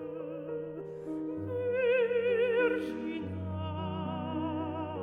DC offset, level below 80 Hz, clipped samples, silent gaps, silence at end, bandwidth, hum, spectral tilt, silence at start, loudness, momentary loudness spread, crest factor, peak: under 0.1%; -64 dBFS; under 0.1%; none; 0 s; 4.9 kHz; none; -8 dB/octave; 0 s; -33 LUFS; 11 LU; 16 dB; -16 dBFS